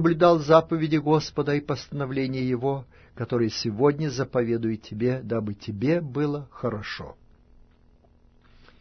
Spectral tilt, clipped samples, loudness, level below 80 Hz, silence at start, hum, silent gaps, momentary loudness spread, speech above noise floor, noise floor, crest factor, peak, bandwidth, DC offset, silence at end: -7 dB/octave; under 0.1%; -25 LUFS; -54 dBFS; 0 s; none; none; 12 LU; 33 dB; -57 dBFS; 22 dB; -4 dBFS; 6.6 kHz; under 0.1%; 1.7 s